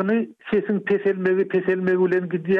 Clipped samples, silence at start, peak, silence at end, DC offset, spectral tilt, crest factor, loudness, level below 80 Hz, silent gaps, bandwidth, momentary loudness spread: under 0.1%; 0 s; -10 dBFS; 0 s; under 0.1%; -9.5 dB/octave; 10 dB; -22 LUFS; -66 dBFS; none; 4.3 kHz; 4 LU